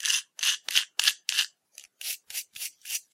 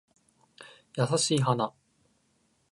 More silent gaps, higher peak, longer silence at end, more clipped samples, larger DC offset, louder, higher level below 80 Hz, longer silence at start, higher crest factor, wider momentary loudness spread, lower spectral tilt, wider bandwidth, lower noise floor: neither; first, -2 dBFS vs -12 dBFS; second, 0.15 s vs 1.05 s; neither; neither; about the same, -28 LUFS vs -28 LUFS; second, under -90 dBFS vs -74 dBFS; second, 0 s vs 0.6 s; first, 30 dB vs 20 dB; second, 13 LU vs 23 LU; second, 7 dB/octave vs -4.5 dB/octave; first, 16.5 kHz vs 11.5 kHz; second, -54 dBFS vs -71 dBFS